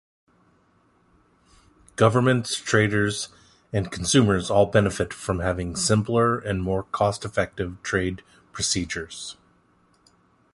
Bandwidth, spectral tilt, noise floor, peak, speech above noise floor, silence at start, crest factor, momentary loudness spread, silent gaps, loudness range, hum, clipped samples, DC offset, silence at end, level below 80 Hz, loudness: 11.5 kHz; -4.5 dB/octave; -62 dBFS; -2 dBFS; 39 dB; 2 s; 22 dB; 12 LU; none; 5 LU; none; under 0.1%; under 0.1%; 1.2 s; -46 dBFS; -23 LUFS